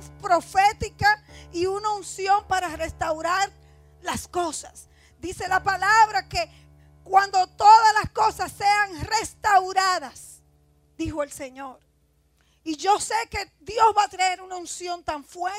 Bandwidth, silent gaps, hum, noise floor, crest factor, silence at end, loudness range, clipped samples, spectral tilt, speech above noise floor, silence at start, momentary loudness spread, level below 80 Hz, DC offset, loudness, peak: 15.5 kHz; none; none; -64 dBFS; 20 dB; 0 s; 9 LU; under 0.1%; -2.5 dB/octave; 41 dB; 0 s; 16 LU; -50 dBFS; under 0.1%; -22 LUFS; -4 dBFS